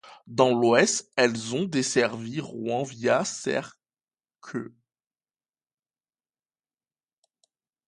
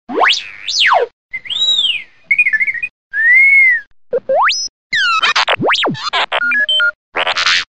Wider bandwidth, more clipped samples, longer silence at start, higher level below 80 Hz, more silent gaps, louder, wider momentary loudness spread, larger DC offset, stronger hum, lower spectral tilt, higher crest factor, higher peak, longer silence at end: first, 11.5 kHz vs 9.8 kHz; neither; about the same, 0.05 s vs 0.1 s; second, -72 dBFS vs -58 dBFS; second, none vs 1.13-1.29 s, 2.90-3.10 s, 3.87-3.91 s, 4.69-4.90 s, 6.95-7.12 s; second, -25 LUFS vs -12 LUFS; first, 16 LU vs 12 LU; second, under 0.1% vs 0.9%; neither; first, -4 dB/octave vs -1 dB/octave; first, 24 dB vs 12 dB; about the same, -4 dBFS vs -2 dBFS; first, 3.2 s vs 0.15 s